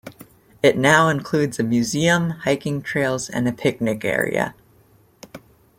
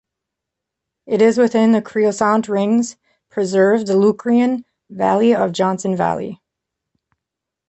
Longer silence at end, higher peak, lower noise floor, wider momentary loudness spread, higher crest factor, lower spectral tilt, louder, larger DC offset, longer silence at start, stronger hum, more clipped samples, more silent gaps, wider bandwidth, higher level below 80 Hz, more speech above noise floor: second, 0.4 s vs 1.35 s; about the same, -2 dBFS vs -2 dBFS; second, -55 dBFS vs -83 dBFS; about the same, 8 LU vs 9 LU; first, 20 dB vs 14 dB; about the same, -5 dB/octave vs -6 dB/octave; second, -20 LUFS vs -16 LUFS; neither; second, 0.05 s vs 1.05 s; neither; neither; neither; first, 16.5 kHz vs 8.4 kHz; first, -54 dBFS vs -60 dBFS; second, 35 dB vs 67 dB